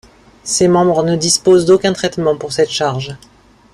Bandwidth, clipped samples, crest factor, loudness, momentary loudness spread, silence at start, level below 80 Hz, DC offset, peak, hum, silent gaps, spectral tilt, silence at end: 13 kHz; under 0.1%; 14 dB; -13 LUFS; 9 LU; 0.45 s; -48 dBFS; under 0.1%; 0 dBFS; none; none; -4.5 dB/octave; 0.6 s